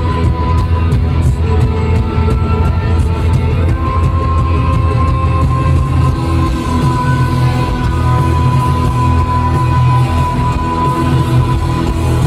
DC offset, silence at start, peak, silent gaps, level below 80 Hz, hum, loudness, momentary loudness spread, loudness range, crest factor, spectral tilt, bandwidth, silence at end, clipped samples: under 0.1%; 0 s; -2 dBFS; none; -18 dBFS; none; -13 LUFS; 2 LU; 1 LU; 10 dB; -7.5 dB/octave; 12 kHz; 0 s; under 0.1%